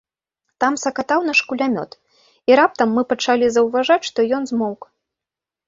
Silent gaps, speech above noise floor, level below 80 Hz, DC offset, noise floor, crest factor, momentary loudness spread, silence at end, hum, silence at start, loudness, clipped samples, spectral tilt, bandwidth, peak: none; 70 dB; -62 dBFS; under 0.1%; -87 dBFS; 18 dB; 10 LU; 0.9 s; none; 0.6 s; -18 LUFS; under 0.1%; -3.5 dB/octave; 7.8 kHz; -2 dBFS